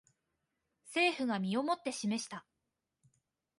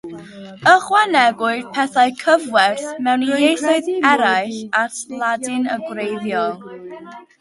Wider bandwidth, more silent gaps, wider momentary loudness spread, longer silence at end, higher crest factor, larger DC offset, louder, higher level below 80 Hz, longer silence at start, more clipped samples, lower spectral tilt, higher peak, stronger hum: about the same, 11.5 kHz vs 11.5 kHz; neither; second, 10 LU vs 19 LU; first, 1.2 s vs 0.2 s; about the same, 18 dB vs 18 dB; neither; second, -34 LUFS vs -17 LUFS; second, -82 dBFS vs -66 dBFS; first, 0.85 s vs 0.05 s; neither; about the same, -4 dB/octave vs -3 dB/octave; second, -20 dBFS vs 0 dBFS; neither